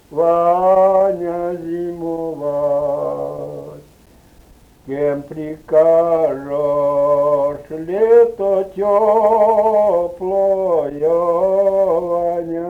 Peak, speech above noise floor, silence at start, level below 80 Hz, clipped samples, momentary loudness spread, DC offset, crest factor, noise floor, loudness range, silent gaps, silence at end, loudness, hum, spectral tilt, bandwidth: -2 dBFS; 34 dB; 0.1 s; -50 dBFS; under 0.1%; 12 LU; under 0.1%; 14 dB; -47 dBFS; 8 LU; none; 0 s; -16 LUFS; none; -8.5 dB/octave; 8.2 kHz